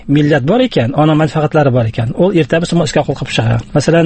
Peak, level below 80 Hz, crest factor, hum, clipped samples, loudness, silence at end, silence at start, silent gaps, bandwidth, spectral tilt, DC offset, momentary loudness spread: 0 dBFS; -38 dBFS; 12 dB; none; under 0.1%; -12 LUFS; 0 s; 0.05 s; none; 8.8 kHz; -6.5 dB/octave; under 0.1%; 4 LU